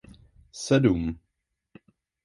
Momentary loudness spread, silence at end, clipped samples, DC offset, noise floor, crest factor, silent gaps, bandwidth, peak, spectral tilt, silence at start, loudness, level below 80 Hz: 22 LU; 1.1 s; under 0.1%; under 0.1%; -80 dBFS; 22 dB; none; 11.5 kHz; -8 dBFS; -6.5 dB/octave; 0.55 s; -25 LUFS; -48 dBFS